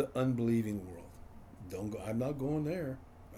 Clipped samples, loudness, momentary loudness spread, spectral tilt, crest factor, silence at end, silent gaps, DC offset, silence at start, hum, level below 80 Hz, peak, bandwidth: under 0.1%; -36 LUFS; 20 LU; -8 dB/octave; 16 dB; 0 s; none; under 0.1%; 0 s; none; -58 dBFS; -20 dBFS; 16 kHz